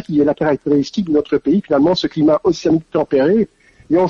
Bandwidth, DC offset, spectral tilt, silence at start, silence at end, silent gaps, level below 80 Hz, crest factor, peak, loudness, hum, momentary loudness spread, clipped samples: 7.4 kHz; under 0.1%; -7 dB/octave; 0.1 s; 0 s; none; -48 dBFS; 10 dB; -4 dBFS; -16 LUFS; none; 4 LU; under 0.1%